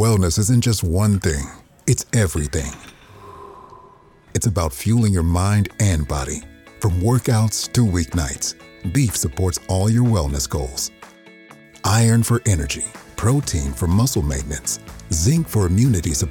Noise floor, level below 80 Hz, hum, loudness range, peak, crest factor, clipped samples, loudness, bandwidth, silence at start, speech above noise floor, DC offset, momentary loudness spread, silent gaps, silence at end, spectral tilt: -48 dBFS; -32 dBFS; none; 3 LU; -4 dBFS; 16 dB; under 0.1%; -20 LUFS; 17.5 kHz; 0 s; 30 dB; under 0.1%; 10 LU; none; 0 s; -5 dB/octave